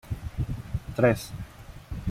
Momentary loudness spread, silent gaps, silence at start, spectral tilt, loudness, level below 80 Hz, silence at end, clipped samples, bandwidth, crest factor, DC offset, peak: 18 LU; none; 0.05 s; -7 dB/octave; -29 LUFS; -40 dBFS; 0 s; under 0.1%; 16 kHz; 22 dB; under 0.1%; -8 dBFS